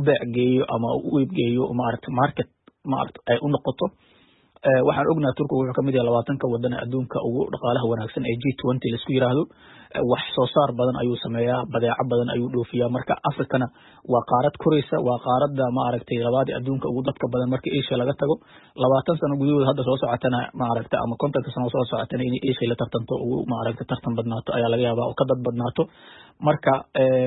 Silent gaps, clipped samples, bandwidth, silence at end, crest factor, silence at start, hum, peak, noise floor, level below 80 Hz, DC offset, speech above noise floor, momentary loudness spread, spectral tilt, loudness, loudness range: none; under 0.1%; 4.1 kHz; 0 s; 16 dB; 0 s; none; -6 dBFS; -57 dBFS; -56 dBFS; under 0.1%; 34 dB; 6 LU; -11.5 dB/octave; -23 LUFS; 2 LU